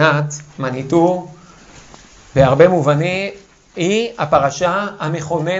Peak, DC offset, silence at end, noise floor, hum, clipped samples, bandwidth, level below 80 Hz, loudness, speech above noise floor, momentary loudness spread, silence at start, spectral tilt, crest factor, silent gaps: 0 dBFS; under 0.1%; 0 s; -42 dBFS; none; under 0.1%; 8 kHz; -44 dBFS; -16 LUFS; 27 dB; 13 LU; 0 s; -6 dB/octave; 16 dB; none